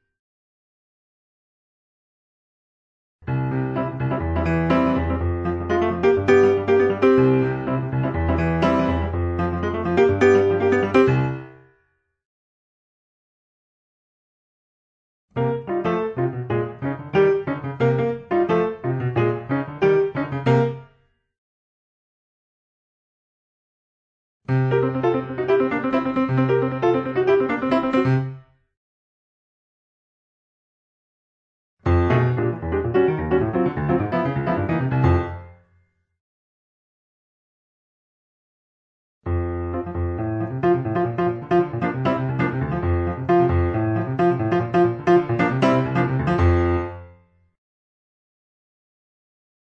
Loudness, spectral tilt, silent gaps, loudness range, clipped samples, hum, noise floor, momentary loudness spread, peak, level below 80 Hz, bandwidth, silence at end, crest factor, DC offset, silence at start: -21 LUFS; -9 dB/octave; 12.25-15.28 s, 21.38-24.40 s, 28.77-31.77 s, 36.20-39.21 s; 10 LU; under 0.1%; none; -68 dBFS; 9 LU; -4 dBFS; -40 dBFS; 7.6 kHz; 2.65 s; 18 dB; under 0.1%; 3.25 s